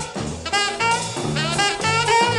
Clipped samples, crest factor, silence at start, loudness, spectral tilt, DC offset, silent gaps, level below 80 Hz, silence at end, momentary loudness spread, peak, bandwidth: under 0.1%; 16 dB; 0 s; -20 LUFS; -3 dB/octave; under 0.1%; none; -46 dBFS; 0 s; 7 LU; -4 dBFS; 13 kHz